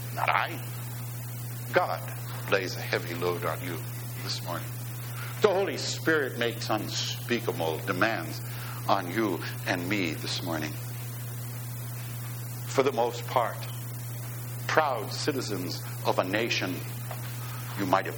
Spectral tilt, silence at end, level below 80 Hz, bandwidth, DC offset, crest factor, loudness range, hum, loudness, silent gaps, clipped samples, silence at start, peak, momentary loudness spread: -4.5 dB/octave; 0 s; -62 dBFS; over 20 kHz; under 0.1%; 24 dB; 3 LU; none; -30 LUFS; none; under 0.1%; 0 s; -6 dBFS; 10 LU